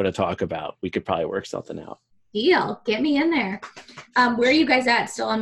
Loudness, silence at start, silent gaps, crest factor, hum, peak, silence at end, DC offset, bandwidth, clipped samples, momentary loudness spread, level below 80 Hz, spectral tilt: -22 LUFS; 0 s; none; 18 dB; none; -6 dBFS; 0 s; under 0.1%; 12 kHz; under 0.1%; 17 LU; -60 dBFS; -4.5 dB/octave